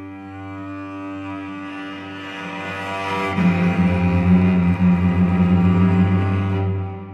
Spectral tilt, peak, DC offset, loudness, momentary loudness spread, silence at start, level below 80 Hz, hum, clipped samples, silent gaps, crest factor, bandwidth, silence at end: -8.5 dB/octave; -6 dBFS; under 0.1%; -18 LUFS; 16 LU; 0 s; -50 dBFS; none; under 0.1%; none; 14 dB; 6.4 kHz; 0 s